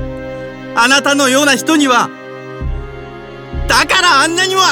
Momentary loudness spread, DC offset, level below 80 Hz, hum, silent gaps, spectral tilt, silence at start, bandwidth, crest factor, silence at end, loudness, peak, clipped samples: 20 LU; under 0.1%; -30 dBFS; none; none; -2.5 dB/octave; 0 s; 19 kHz; 14 dB; 0 s; -10 LUFS; 0 dBFS; under 0.1%